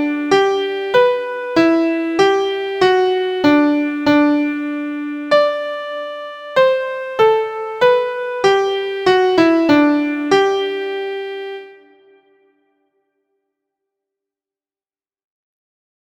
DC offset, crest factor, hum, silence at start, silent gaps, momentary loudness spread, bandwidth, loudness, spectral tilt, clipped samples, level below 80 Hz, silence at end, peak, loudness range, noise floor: under 0.1%; 16 dB; none; 0 s; none; 11 LU; 9.4 kHz; -16 LUFS; -5 dB/octave; under 0.1%; -58 dBFS; 4.3 s; 0 dBFS; 7 LU; under -90 dBFS